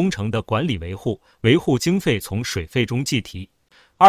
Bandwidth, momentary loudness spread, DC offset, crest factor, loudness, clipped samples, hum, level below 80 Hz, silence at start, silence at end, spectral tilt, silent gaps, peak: 16 kHz; 10 LU; under 0.1%; 20 dB; -22 LUFS; under 0.1%; none; -42 dBFS; 0 s; 0 s; -5.5 dB/octave; none; 0 dBFS